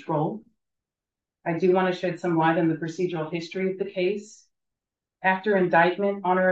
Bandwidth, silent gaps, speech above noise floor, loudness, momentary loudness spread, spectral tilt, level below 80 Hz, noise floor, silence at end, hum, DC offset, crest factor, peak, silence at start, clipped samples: 8 kHz; none; 65 dB; -25 LUFS; 10 LU; -7 dB/octave; -76 dBFS; -89 dBFS; 0 s; none; under 0.1%; 18 dB; -8 dBFS; 0 s; under 0.1%